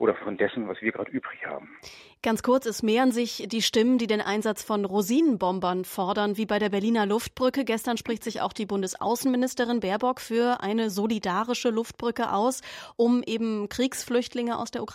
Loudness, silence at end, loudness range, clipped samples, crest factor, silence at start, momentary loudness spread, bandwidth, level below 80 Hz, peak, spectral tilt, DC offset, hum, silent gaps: -26 LUFS; 0 s; 2 LU; under 0.1%; 18 dB; 0 s; 8 LU; 16 kHz; -62 dBFS; -10 dBFS; -4.5 dB/octave; under 0.1%; none; none